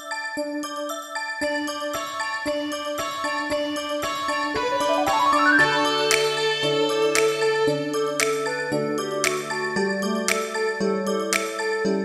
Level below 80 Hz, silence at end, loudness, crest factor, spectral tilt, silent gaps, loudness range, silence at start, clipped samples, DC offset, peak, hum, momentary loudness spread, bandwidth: -58 dBFS; 0 s; -23 LUFS; 22 dB; -3 dB/octave; none; 7 LU; 0 s; under 0.1%; under 0.1%; -2 dBFS; none; 9 LU; 16 kHz